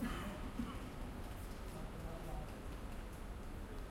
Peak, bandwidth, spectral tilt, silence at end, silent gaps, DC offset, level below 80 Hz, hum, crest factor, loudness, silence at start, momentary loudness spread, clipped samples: -30 dBFS; 16.5 kHz; -6 dB/octave; 0 s; none; under 0.1%; -48 dBFS; none; 16 dB; -49 LUFS; 0 s; 5 LU; under 0.1%